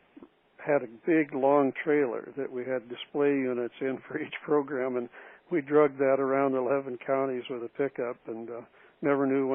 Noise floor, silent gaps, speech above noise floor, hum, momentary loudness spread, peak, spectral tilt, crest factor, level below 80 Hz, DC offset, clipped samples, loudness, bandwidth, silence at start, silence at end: -55 dBFS; none; 27 dB; none; 12 LU; -10 dBFS; -5 dB/octave; 18 dB; -82 dBFS; under 0.1%; under 0.1%; -29 LUFS; 3.7 kHz; 0.15 s; 0 s